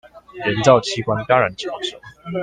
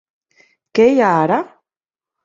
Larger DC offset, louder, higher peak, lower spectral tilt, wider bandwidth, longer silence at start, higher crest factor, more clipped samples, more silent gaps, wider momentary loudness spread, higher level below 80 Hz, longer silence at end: neither; second, -19 LUFS vs -15 LUFS; about the same, 0 dBFS vs -2 dBFS; second, -5 dB/octave vs -7 dB/octave; first, 9.8 kHz vs 7.6 kHz; second, 0.15 s vs 0.75 s; about the same, 20 dB vs 16 dB; neither; neither; first, 14 LU vs 10 LU; first, -52 dBFS vs -60 dBFS; second, 0 s vs 0.8 s